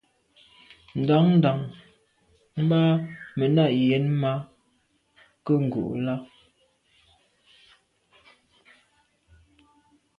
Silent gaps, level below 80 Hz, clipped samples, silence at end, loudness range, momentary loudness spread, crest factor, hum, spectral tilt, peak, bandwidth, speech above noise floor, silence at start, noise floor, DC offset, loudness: none; -64 dBFS; under 0.1%; 3.95 s; 8 LU; 15 LU; 18 dB; none; -9.5 dB/octave; -8 dBFS; 5 kHz; 46 dB; 0.95 s; -68 dBFS; under 0.1%; -24 LUFS